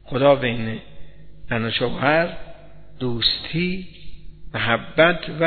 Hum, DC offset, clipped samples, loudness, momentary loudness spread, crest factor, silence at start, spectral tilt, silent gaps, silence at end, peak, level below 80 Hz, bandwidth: 50 Hz at -50 dBFS; 1%; under 0.1%; -21 LUFS; 15 LU; 20 dB; 0 s; -8.5 dB/octave; none; 0 s; -2 dBFS; -44 dBFS; 4.6 kHz